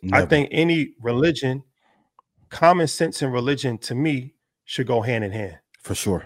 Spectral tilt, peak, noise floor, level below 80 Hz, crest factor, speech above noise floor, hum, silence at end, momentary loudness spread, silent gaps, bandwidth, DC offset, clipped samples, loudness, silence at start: -5.5 dB/octave; 0 dBFS; -65 dBFS; -52 dBFS; 22 dB; 44 dB; none; 0 s; 14 LU; none; 16 kHz; under 0.1%; under 0.1%; -22 LUFS; 0 s